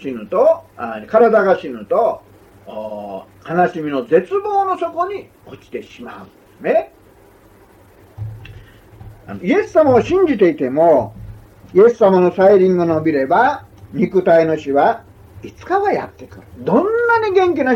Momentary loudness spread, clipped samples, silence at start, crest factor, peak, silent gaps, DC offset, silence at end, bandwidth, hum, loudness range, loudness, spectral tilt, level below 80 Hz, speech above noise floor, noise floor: 20 LU; under 0.1%; 0 s; 14 dB; -2 dBFS; none; under 0.1%; 0 s; 7.6 kHz; none; 12 LU; -15 LUFS; -7.5 dB/octave; -50 dBFS; 32 dB; -47 dBFS